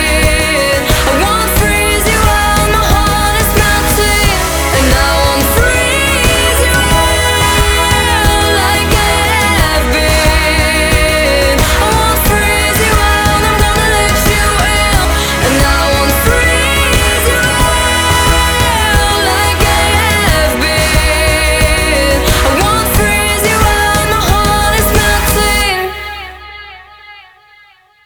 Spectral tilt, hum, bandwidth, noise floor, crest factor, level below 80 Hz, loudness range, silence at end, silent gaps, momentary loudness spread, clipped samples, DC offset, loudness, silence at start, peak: -3.5 dB/octave; none; over 20 kHz; -45 dBFS; 10 dB; -16 dBFS; 1 LU; 0.85 s; none; 1 LU; under 0.1%; under 0.1%; -10 LUFS; 0 s; 0 dBFS